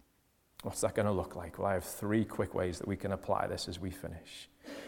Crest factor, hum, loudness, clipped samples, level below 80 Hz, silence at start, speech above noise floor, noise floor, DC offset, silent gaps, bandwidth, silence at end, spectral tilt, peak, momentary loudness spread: 20 dB; none; -36 LUFS; under 0.1%; -58 dBFS; 0.6 s; 36 dB; -72 dBFS; under 0.1%; none; 18 kHz; 0 s; -5.5 dB/octave; -16 dBFS; 13 LU